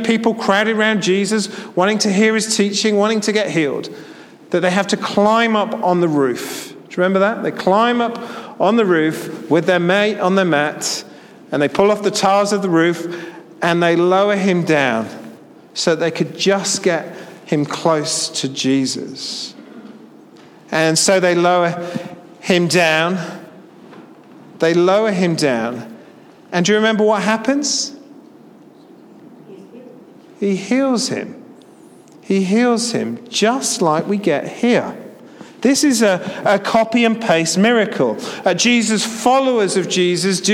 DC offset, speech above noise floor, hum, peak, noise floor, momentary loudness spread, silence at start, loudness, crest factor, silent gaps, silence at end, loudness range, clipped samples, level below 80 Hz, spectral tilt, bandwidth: under 0.1%; 27 dB; none; 0 dBFS; -43 dBFS; 11 LU; 0 s; -16 LUFS; 16 dB; none; 0 s; 5 LU; under 0.1%; -64 dBFS; -4 dB/octave; 16 kHz